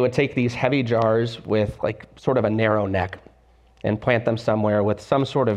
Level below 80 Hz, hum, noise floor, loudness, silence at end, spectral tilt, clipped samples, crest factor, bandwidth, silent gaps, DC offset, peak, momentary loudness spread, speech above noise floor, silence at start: -50 dBFS; none; -55 dBFS; -22 LUFS; 0 s; -7.5 dB/octave; under 0.1%; 16 dB; 10 kHz; none; under 0.1%; -6 dBFS; 8 LU; 34 dB; 0 s